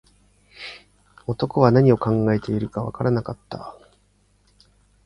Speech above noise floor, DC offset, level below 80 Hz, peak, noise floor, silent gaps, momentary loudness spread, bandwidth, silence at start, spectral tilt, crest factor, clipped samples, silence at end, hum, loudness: 41 dB; under 0.1%; -50 dBFS; 0 dBFS; -61 dBFS; none; 21 LU; 10.5 kHz; 0.6 s; -9 dB/octave; 22 dB; under 0.1%; 1.35 s; 50 Hz at -50 dBFS; -21 LUFS